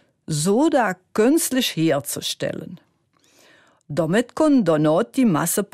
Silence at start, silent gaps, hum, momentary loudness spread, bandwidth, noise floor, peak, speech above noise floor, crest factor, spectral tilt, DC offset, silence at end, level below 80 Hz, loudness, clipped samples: 0.3 s; none; none; 10 LU; 15.5 kHz; -62 dBFS; -6 dBFS; 42 dB; 14 dB; -4.5 dB/octave; under 0.1%; 0.1 s; -60 dBFS; -20 LUFS; under 0.1%